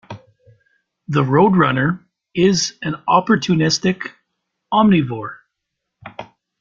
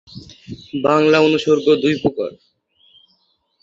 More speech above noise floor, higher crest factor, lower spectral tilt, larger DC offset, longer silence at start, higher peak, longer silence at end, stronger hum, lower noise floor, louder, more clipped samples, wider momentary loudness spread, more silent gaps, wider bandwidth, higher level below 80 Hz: first, 62 dB vs 47 dB; about the same, 16 dB vs 18 dB; about the same, -5.5 dB/octave vs -6 dB/octave; neither; about the same, 0.1 s vs 0.15 s; about the same, -2 dBFS vs -2 dBFS; second, 0.35 s vs 1.3 s; neither; first, -78 dBFS vs -63 dBFS; about the same, -17 LUFS vs -16 LUFS; neither; about the same, 22 LU vs 23 LU; neither; about the same, 7.6 kHz vs 7.6 kHz; about the same, -54 dBFS vs -54 dBFS